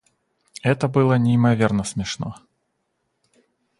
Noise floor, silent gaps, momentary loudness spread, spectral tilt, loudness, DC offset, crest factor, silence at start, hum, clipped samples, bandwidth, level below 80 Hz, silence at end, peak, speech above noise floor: -73 dBFS; none; 13 LU; -6.5 dB/octave; -20 LUFS; under 0.1%; 18 dB; 0.65 s; none; under 0.1%; 11.5 kHz; -52 dBFS; 1.4 s; -4 dBFS; 54 dB